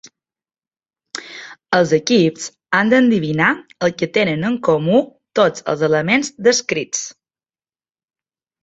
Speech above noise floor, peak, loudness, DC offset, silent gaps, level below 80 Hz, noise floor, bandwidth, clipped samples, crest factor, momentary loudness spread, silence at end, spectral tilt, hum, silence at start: over 74 dB; 0 dBFS; -17 LUFS; under 0.1%; none; -58 dBFS; under -90 dBFS; 8.2 kHz; under 0.1%; 18 dB; 16 LU; 1.5 s; -4.5 dB/octave; none; 1.15 s